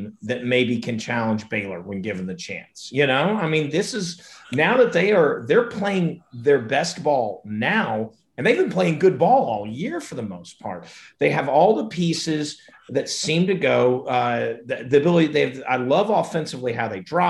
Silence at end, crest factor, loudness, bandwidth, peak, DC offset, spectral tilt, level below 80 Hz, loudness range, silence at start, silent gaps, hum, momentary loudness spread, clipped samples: 0 s; 16 dB; -21 LUFS; 12 kHz; -4 dBFS; under 0.1%; -5.5 dB/octave; -62 dBFS; 3 LU; 0 s; none; none; 13 LU; under 0.1%